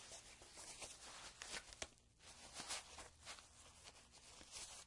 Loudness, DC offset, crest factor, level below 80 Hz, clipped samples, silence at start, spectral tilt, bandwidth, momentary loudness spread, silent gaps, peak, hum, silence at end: -54 LUFS; under 0.1%; 28 dB; -72 dBFS; under 0.1%; 0 s; -0.5 dB/octave; 12 kHz; 12 LU; none; -28 dBFS; none; 0 s